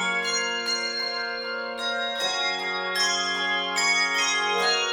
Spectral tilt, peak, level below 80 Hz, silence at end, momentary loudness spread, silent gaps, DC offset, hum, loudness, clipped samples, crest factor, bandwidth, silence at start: 0 dB/octave; -12 dBFS; -68 dBFS; 0 s; 7 LU; none; under 0.1%; none; -24 LUFS; under 0.1%; 14 dB; 17.5 kHz; 0 s